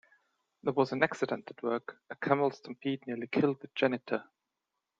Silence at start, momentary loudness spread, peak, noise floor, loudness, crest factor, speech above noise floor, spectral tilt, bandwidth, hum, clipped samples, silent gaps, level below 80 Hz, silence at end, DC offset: 0.65 s; 8 LU; -8 dBFS; -87 dBFS; -33 LUFS; 24 dB; 54 dB; -6.5 dB/octave; 7.8 kHz; none; under 0.1%; none; -80 dBFS; 0.75 s; under 0.1%